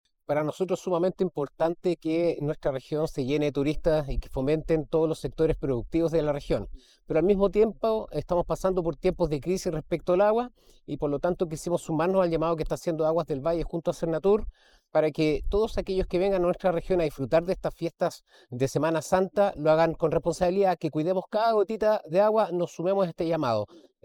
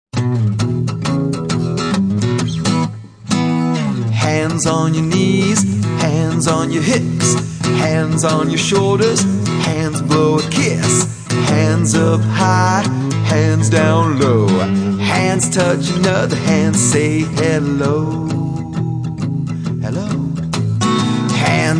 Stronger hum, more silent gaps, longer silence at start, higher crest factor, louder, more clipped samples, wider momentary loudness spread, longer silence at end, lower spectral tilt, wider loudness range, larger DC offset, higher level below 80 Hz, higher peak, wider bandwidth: neither; neither; first, 0.3 s vs 0.15 s; about the same, 16 dB vs 14 dB; second, -27 LUFS vs -15 LUFS; neither; about the same, 7 LU vs 6 LU; first, 0.4 s vs 0 s; first, -7 dB/octave vs -5 dB/octave; about the same, 3 LU vs 4 LU; neither; about the same, -42 dBFS vs -44 dBFS; second, -10 dBFS vs 0 dBFS; first, 18 kHz vs 10.5 kHz